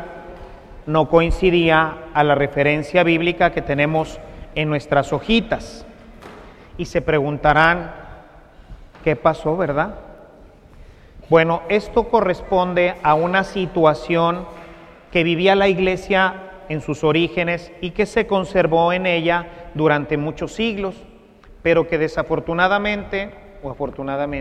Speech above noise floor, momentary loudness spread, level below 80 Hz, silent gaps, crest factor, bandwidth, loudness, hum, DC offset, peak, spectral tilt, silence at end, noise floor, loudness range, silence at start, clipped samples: 27 dB; 13 LU; -38 dBFS; none; 20 dB; 10.5 kHz; -19 LUFS; none; under 0.1%; 0 dBFS; -6.5 dB/octave; 0 s; -45 dBFS; 4 LU; 0 s; under 0.1%